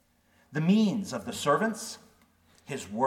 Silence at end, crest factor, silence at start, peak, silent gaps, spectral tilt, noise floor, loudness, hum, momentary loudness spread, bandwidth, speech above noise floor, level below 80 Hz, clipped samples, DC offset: 0 s; 18 dB; 0.5 s; -12 dBFS; none; -5.5 dB/octave; -66 dBFS; -29 LUFS; none; 16 LU; 16 kHz; 38 dB; -70 dBFS; under 0.1%; under 0.1%